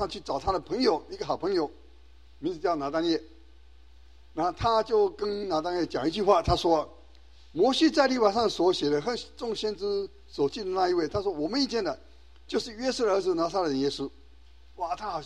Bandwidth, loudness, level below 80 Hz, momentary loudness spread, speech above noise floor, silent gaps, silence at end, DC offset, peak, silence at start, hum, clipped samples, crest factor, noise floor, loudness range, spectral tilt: 11.5 kHz; -28 LUFS; -50 dBFS; 11 LU; 28 dB; none; 0 s; 0.2%; -8 dBFS; 0 s; none; under 0.1%; 20 dB; -55 dBFS; 5 LU; -5 dB/octave